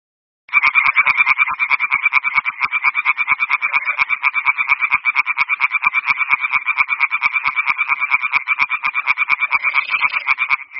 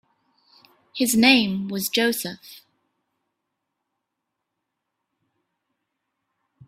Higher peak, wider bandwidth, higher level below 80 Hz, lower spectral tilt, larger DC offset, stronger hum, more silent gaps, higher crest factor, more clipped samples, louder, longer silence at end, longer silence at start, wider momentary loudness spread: about the same, 0 dBFS vs -2 dBFS; second, 6 kHz vs 16 kHz; first, -60 dBFS vs -66 dBFS; second, 3.5 dB/octave vs -3 dB/octave; neither; neither; neither; second, 18 dB vs 24 dB; neither; first, -15 LUFS vs -20 LUFS; second, 0 s vs 4.1 s; second, 0.5 s vs 0.95 s; second, 4 LU vs 19 LU